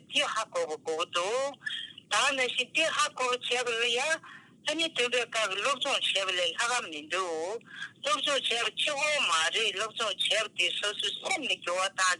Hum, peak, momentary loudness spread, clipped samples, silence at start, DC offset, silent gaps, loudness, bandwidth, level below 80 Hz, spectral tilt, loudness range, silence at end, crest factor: none; -14 dBFS; 7 LU; under 0.1%; 0.1 s; under 0.1%; none; -28 LUFS; 12 kHz; -88 dBFS; 0 dB/octave; 2 LU; 0 s; 16 dB